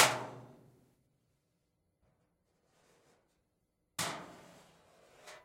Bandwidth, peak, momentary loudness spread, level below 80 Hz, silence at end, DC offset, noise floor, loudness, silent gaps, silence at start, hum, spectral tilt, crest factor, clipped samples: 16 kHz; -10 dBFS; 22 LU; -82 dBFS; 0.05 s; under 0.1%; -81 dBFS; -36 LUFS; none; 0 s; none; -1.5 dB/octave; 32 dB; under 0.1%